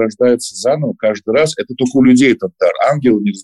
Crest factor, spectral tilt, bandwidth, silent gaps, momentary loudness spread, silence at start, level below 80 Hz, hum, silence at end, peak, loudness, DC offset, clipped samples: 12 dB; -5.5 dB/octave; 12 kHz; none; 7 LU; 0 s; -52 dBFS; none; 0 s; -2 dBFS; -13 LUFS; under 0.1%; under 0.1%